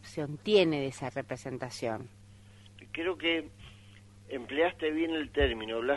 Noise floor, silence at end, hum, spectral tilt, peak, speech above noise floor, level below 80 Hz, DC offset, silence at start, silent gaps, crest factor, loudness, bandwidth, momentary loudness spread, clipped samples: -54 dBFS; 0 s; none; -5.5 dB/octave; -12 dBFS; 23 dB; -48 dBFS; under 0.1%; 0.05 s; none; 20 dB; -32 LUFS; 11.5 kHz; 16 LU; under 0.1%